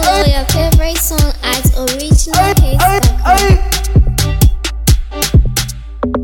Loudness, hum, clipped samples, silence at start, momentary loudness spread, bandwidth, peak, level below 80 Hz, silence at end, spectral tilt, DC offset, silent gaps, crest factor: -12 LUFS; none; under 0.1%; 0 s; 6 LU; 19.5 kHz; 0 dBFS; -14 dBFS; 0 s; -4.5 dB/octave; under 0.1%; none; 10 dB